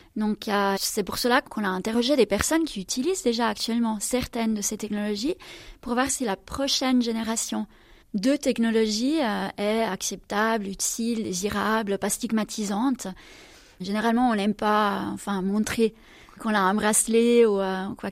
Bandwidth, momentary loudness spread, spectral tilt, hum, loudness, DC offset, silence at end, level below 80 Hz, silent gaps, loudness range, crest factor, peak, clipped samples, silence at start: 16 kHz; 8 LU; -3.5 dB/octave; none; -25 LUFS; under 0.1%; 0 s; -52 dBFS; none; 3 LU; 20 dB; -4 dBFS; under 0.1%; 0.15 s